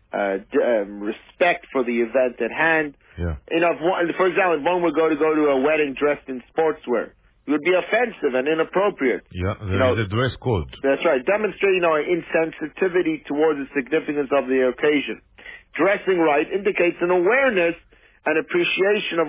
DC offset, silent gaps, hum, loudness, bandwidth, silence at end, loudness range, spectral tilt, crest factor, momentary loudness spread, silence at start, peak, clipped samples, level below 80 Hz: under 0.1%; none; none; -21 LUFS; 4 kHz; 0 s; 2 LU; -9.5 dB/octave; 14 dB; 9 LU; 0.15 s; -6 dBFS; under 0.1%; -44 dBFS